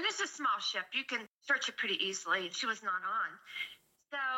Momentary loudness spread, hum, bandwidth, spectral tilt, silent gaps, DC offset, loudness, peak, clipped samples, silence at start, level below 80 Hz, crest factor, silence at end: 9 LU; none; 16.5 kHz; -0.5 dB/octave; 1.28-1.41 s; under 0.1%; -35 LUFS; -18 dBFS; under 0.1%; 0 s; under -90 dBFS; 18 dB; 0 s